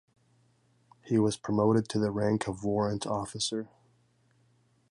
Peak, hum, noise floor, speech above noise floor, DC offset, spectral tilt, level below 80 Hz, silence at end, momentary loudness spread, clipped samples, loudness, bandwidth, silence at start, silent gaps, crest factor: -14 dBFS; none; -68 dBFS; 39 dB; under 0.1%; -5.5 dB/octave; -60 dBFS; 1.25 s; 7 LU; under 0.1%; -30 LUFS; 11.5 kHz; 1.05 s; none; 18 dB